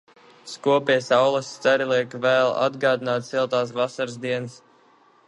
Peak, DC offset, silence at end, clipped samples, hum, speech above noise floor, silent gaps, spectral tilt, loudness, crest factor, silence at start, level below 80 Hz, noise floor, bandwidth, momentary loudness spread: -6 dBFS; under 0.1%; 0.7 s; under 0.1%; none; 35 dB; none; -4.5 dB/octave; -22 LUFS; 18 dB; 0.45 s; -74 dBFS; -57 dBFS; 11.5 kHz; 8 LU